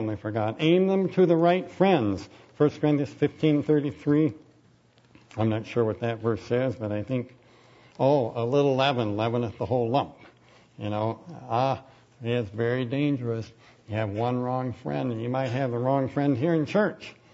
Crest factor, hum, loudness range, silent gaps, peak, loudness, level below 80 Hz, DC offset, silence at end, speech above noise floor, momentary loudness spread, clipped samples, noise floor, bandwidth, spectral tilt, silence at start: 18 dB; none; 6 LU; none; -8 dBFS; -26 LUFS; -64 dBFS; under 0.1%; 0.25 s; 34 dB; 10 LU; under 0.1%; -60 dBFS; 7.8 kHz; -8 dB/octave; 0 s